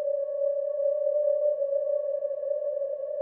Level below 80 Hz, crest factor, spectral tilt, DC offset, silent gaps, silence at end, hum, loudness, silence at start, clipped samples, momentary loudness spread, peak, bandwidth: -84 dBFS; 12 dB; -5 dB/octave; under 0.1%; none; 0 s; none; -28 LUFS; 0 s; under 0.1%; 5 LU; -16 dBFS; 1.9 kHz